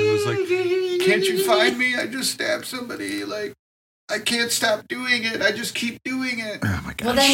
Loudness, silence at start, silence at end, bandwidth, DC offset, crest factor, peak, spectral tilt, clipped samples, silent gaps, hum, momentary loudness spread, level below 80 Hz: -22 LUFS; 0 s; 0 s; 17 kHz; under 0.1%; 18 dB; -4 dBFS; -3 dB/octave; under 0.1%; 3.59-4.08 s; none; 10 LU; -54 dBFS